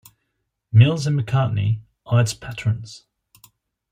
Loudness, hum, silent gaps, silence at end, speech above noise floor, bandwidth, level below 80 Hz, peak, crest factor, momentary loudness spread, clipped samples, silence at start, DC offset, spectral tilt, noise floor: -20 LUFS; none; none; 0.95 s; 57 dB; 14.5 kHz; -54 dBFS; -2 dBFS; 18 dB; 12 LU; under 0.1%; 0.75 s; under 0.1%; -6.5 dB/octave; -75 dBFS